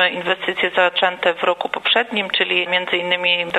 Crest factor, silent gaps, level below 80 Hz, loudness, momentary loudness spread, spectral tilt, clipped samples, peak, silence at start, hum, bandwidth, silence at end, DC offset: 16 dB; none; -64 dBFS; -18 LUFS; 4 LU; -4 dB/octave; under 0.1%; -2 dBFS; 0 s; none; 12 kHz; 0 s; under 0.1%